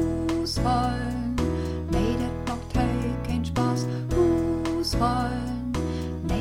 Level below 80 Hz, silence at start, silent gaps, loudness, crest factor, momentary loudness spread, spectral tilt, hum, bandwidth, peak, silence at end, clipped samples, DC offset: -34 dBFS; 0 s; none; -26 LUFS; 16 dB; 6 LU; -6.5 dB/octave; none; 16 kHz; -10 dBFS; 0 s; under 0.1%; 0.3%